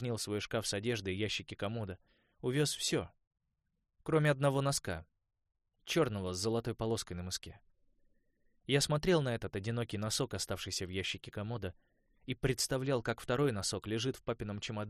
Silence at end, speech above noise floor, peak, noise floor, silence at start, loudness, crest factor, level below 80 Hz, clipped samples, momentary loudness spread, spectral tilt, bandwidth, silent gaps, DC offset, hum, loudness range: 0 s; 48 dB; -16 dBFS; -84 dBFS; 0 s; -35 LUFS; 20 dB; -60 dBFS; under 0.1%; 11 LU; -4.5 dB/octave; 14 kHz; 3.27-3.31 s; under 0.1%; none; 3 LU